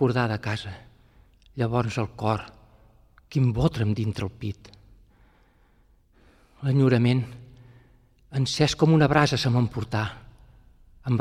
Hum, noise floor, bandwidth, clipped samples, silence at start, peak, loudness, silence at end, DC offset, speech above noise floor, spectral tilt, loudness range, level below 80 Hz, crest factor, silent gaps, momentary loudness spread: none; -60 dBFS; 11 kHz; under 0.1%; 0 s; -4 dBFS; -25 LUFS; 0 s; under 0.1%; 37 dB; -6.5 dB/octave; 7 LU; -48 dBFS; 22 dB; none; 18 LU